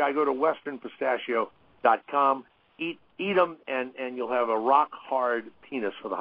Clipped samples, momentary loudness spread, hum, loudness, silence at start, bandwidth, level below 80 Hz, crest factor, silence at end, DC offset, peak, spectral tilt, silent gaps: under 0.1%; 11 LU; none; -27 LUFS; 0 s; 5.2 kHz; -76 dBFS; 20 dB; 0 s; under 0.1%; -8 dBFS; -8.5 dB/octave; none